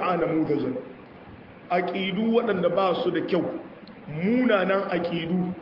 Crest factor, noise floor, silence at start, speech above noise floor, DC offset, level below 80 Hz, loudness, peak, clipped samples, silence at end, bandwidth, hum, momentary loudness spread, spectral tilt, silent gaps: 16 dB; -45 dBFS; 0 s; 21 dB; under 0.1%; -62 dBFS; -25 LUFS; -10 dBFS; under 0.1%; 0 s; 5.8 kHz; none; 21 LU; -9 dB/octave; none